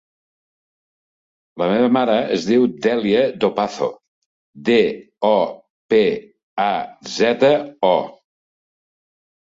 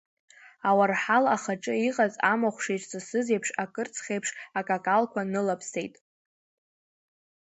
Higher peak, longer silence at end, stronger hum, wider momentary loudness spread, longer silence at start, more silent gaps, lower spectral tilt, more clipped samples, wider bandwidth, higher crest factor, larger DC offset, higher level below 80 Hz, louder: first, -2 dBFS vs -8 dBFS; second, 1.45 s vs 1.65 s; neither; about the same, 9 LU vs 10 LU; first, 1.55 s vs 0.65 s; first, 4.08-4.53 s, 5.70-5.89 s, 6.43-6.57 s vs none; about the same, -5.5 dB/octave vs -4.5 dB/octave; neither; about the same, 7.8 kHz vs 8.2 kHz; about the same, 18 dB vs 20 dB; neither; first, -62 dBFS vs -76 dBFS; first, -18 LUFS vs -27 LUFS